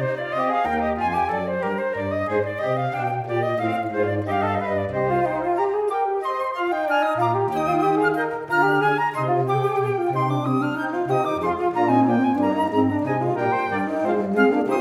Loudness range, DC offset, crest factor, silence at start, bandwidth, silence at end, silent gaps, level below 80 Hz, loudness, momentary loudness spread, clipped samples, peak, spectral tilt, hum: 3 LU; under 0.1%; 16 dB; 0 s; 14.5 kHz; 0 s; none; -54 dBFS; -22 LUFS; 5 LU; under 0.1%; -6 dBFS; -7.5 dB/octave; none